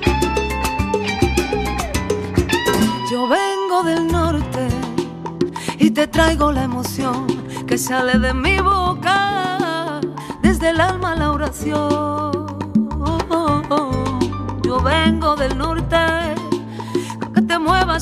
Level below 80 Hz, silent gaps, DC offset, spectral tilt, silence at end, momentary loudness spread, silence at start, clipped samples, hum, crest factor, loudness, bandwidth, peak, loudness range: -30 dBFS; none; under 0.1%; -5 dB/octave; 0 s; 8 LU; 0 s; under 0.1%; none; 18 dB; -18 LUFS; 15.5 kHz; 0 dBFS; 2 LU